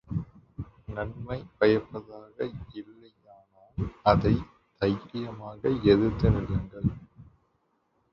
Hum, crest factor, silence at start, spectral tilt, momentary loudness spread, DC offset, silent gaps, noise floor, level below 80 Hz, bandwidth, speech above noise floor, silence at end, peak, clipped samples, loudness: none; 24 dB; 0.1 s; -9.5 dB/octave; 21 LU; under 0.1%; none; -72 dBFS; -44 dBFS; 6.6 kHz; 46 dB; 0.9 s; -6 dBFS; under 0.1%; -28 LUFS